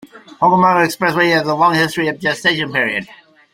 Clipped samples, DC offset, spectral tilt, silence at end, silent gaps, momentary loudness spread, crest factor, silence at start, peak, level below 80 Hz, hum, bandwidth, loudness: under 0.1%; under 0.1%; -4.5 dB/octave; 0.4 s; none; 6 LU; 14 dB; 0.15 s; -2 dBFS; -56 dBFS; none; 16.5 kHz; -15 LUFS